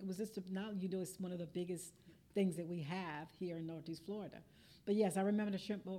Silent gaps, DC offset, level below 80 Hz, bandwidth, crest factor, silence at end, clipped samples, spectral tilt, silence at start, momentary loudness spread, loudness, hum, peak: none; under 0.1%; -78 dBFS; 15.5 kHz; 18 dB; 0 s; under 0.1%; -6 dB/octave; 0 s; 11 LU; -42 LUFS; none; -24 dBFS